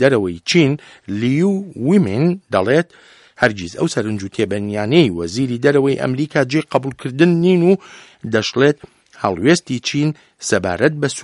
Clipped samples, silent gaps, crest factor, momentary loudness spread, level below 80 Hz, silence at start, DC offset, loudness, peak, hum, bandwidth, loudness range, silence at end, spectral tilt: under 0.1%; none; 16 dB; 8 LU; -54 dBFS; 0 s; under 0.1%; -17 LUFS; 0 dBFS; none; 11.5 kHz; 2 LU; 0 s; -5.5 dB/octave